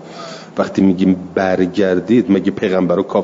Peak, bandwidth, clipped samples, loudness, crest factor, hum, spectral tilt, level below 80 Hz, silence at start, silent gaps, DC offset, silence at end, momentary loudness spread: -2 dBFS; 7.6 kHz; under 0.1%; -15 LUFS; 12 dB; none; -7.5 dB/octave; -56 dBFS; 0 s; none; under 0.1%; 0 s; 9 LU